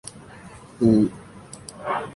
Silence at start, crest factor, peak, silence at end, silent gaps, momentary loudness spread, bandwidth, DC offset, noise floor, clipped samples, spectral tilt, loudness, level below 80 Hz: 0.05 s; 20 dB; -6 dBFS; 0 s; none; 25 LU; 11.5 kHz; under 0.1%; -44 dBFS; under 0.1%; -7 dB/octave; -22 LUFS; -52 dBFS